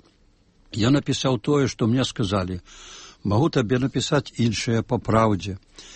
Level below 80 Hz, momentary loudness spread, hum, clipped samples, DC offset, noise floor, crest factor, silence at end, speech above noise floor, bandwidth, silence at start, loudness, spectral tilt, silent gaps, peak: -48 dBFS; 14 LU; none; under 0.1%; under 0.1%; -59 dBFS; 18 dB; 0 s; 37 dB; 8.8 kHz; 0.75 s; -23 LUFS; -6 dB/octave; none; -6 dBFS